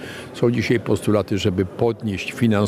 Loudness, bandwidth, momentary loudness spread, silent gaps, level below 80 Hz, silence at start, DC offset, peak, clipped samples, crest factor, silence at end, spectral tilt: -21 LUFS; 14.5 kHz; 5 LU; none; -50 dBFS; 0 s; under 0.1%; -4 dBFS; under 0.1%; 16 dB; 0 s; -6.5 dB/octave